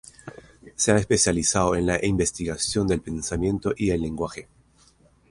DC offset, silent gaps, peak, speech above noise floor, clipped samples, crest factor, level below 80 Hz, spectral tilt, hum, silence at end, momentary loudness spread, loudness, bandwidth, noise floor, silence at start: under 0.1%; none; -6 dBFS; 35 dB; under 0.1%; 20 dB; -42 dBFS; -4 dB/octave; none; 0.9 s; 19 LU; -23 LUFS; 11.5 kHz; -58 dBFS; 0.25 s